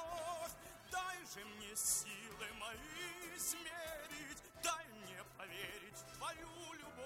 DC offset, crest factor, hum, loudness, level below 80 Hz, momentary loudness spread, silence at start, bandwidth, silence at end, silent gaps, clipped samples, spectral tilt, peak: under 0.1%; 22 dB; none; -45 LUFS; -70 dBFS; 12 LU; 0 s; 16.5 kHz; 0 s; none; under 0.1%; -1 dB/octave; -26 dBFS